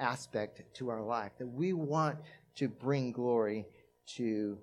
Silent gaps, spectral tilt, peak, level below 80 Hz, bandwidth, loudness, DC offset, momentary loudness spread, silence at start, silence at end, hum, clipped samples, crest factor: none; -6.5 dB/octave; -16 dBFS; -78 dBFS; 11.5 kHz; -36 LUFS; under 0.1%; 14 LU; 0 s; 0 s; none; under 0.1%; 20 dB